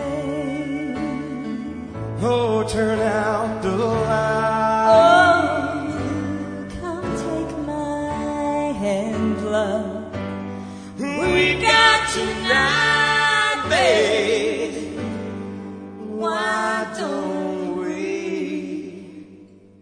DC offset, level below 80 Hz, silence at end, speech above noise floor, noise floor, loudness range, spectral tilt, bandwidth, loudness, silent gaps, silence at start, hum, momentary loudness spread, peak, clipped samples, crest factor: under 0.1%; -46 dBFS; 0.35 s; 26 dB; -46 dBFS; 9 LU; -4.5 dB/octave; 10 kHz; -20 LUFS; none; 0 s; none; 15 LU; -2 dBFS; under 0.1%; 20 dB